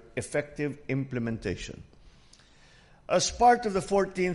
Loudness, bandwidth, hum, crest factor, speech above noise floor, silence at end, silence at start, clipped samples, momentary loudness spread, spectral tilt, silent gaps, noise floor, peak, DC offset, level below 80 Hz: -28 LUFS; 11.5 kHz; none; 20 dB; 29 dB; 0 s; 0.15 s; under 0.1%; 13 LU; -4.5 dB/octave; none; -57 dBFS; -10 dBFS; under 0.1%; -52 dBFS